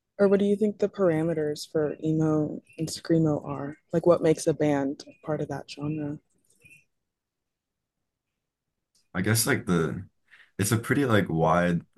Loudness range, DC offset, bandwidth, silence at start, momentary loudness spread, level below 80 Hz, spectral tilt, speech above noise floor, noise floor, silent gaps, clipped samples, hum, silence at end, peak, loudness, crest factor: 12 LU; under 0.1%; 12.5 kHz; 0.2 s; 12 LU; -62 dBFS; -6 dB/octave; 60 dB; -85 dBFS; none; under 0.1%; none; 0.15 s; -8 dBFS; -26 LUFS; 20 dB